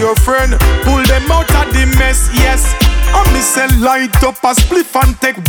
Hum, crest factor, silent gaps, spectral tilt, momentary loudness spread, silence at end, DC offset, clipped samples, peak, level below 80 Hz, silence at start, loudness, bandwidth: none; 10 dB; none; -4 dB/octave; 2 LU; 0 s; under 0.1%; under 0.1%; 0 dBFS; -12 dBFS; 0 s; -11 LUFS; 19.5 kHz